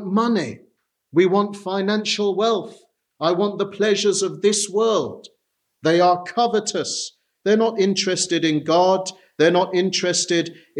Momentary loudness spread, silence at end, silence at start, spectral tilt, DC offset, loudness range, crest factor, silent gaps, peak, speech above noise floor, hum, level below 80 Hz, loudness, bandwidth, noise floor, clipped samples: 8 LU; 0 s; 0 s; -4 dB/octave; under 0.1%; 2 LU; 16 dB; none; -4 dBFS; 33 dB; none; -74 dBFS; -20 LUFS; 12 kHz; -53 dBFS; under 0.1%